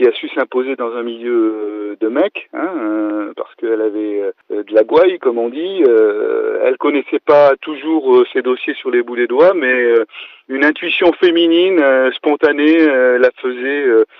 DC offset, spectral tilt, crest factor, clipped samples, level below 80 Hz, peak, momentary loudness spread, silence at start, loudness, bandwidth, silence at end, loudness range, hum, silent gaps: under 0.1%; -6.5 dB/octave; 12 dB; under 0.1%; -64 dBFS; -2 dBFS; 11 LU; 0 s; -14 LUFS; 5.6 kHz; 0.15 s; 6 LU; none; none